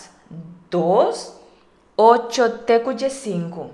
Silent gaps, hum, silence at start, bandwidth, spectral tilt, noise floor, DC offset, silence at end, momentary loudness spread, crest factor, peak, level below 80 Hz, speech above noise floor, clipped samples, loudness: none; none; 0 s; 12 kHz; -5 dB/octave; -54 dBFS; under 0.1%; 0 s; 24 LU; 20 dB; 0 dBFS; -64 dBFS; 36 dB; under 0.1%; -19 LUFS